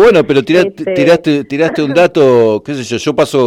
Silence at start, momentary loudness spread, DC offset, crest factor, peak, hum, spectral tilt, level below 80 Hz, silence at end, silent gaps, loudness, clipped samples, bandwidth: 0 s; 7 LU; under 0.1%; 10 dB; 0 dBFS; none; -6 dB/octave; -46 dBFS; 0 s; none; -11 LUFS; under 0.1%; 14.5 kHz